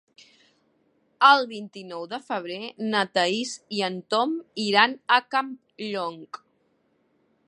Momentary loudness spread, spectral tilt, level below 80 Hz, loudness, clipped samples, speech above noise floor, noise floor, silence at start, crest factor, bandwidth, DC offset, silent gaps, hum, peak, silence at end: 18 LU; -3 dB/octave; -82 dBFS; -24 LUFS; under 0.1%; 44 dB; -68 dBFS; 1.2 s; 24 dB; 10.5 kHz; under 0.1%; none; none; -2 dBFS; 1.1 s